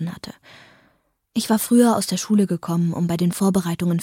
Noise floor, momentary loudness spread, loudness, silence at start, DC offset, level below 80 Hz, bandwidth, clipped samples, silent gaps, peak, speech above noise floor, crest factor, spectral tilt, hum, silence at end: -64 dBFS; 13 LU; -20 LUFS; 0 s; under 0.1%; -58 dBFS; 17 kHz; under 0.1%; none; -4 dBFS; 45 dB; 18 dB; -6 dB/octave; none; 0 s